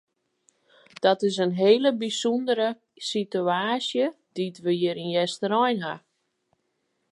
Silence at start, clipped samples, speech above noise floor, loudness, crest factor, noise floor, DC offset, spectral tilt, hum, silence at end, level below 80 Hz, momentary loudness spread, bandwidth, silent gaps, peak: 1 s; under 0.1%; 51 dB; -25 LUFS; 20 dB; -75 dBFS; under 0.1%; -5 dB/octave; none; 1.15 s; -80 dBFS; 9 LU; 11.5 kHz; none; -6 dBFS